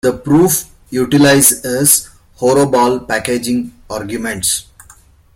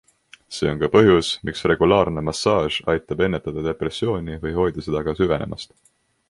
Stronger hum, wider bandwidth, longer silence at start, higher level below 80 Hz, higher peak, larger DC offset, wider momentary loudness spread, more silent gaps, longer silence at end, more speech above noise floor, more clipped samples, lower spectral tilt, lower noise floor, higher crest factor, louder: neither; first, 16.5 kHz vs 11.5 kHz; second, 0.05 s vs 0.5 s; about the same, -44 dBFS vs -42 dBFS; about the same, 0 dBFS vs -2 dBFS; neither; about the same, 12 LU vs 10 LU; neither; about the same, 0.75 s vs 0.65 s; first, 32 dB vs 25 dB; neither; second, -3.5 dB/octave vs -5.5 dB/octave; about the same, -45 dBFS vs -45 dBFS; second, 14 dB vs 20 dB; first, -13 LUFS vs -21 LUFS